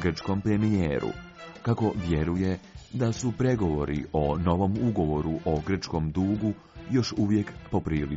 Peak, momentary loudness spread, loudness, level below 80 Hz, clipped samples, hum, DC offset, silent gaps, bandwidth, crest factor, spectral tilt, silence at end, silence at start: -12 dBFS; 6 LU; -28 LUFS; -44 dBFS; under 0.1%; none; under 0.1%; none; 7.6 kHz; 16 dB; -7 dB/octave; 0 s; 0 s